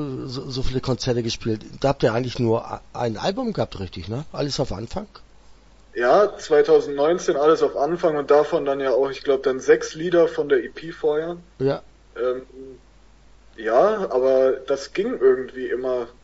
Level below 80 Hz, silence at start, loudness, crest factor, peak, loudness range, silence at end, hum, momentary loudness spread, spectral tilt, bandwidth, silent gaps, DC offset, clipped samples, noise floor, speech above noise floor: -44 dBFS; 0 s; -22 LUFS; 18 dB; -4 dBFS; 7 LU; 0.15 s; none; 13 LU; -6 dB/octave; 8 kHz; none; under 0.1%; under 0.1%; -50 dBFS; 29 dB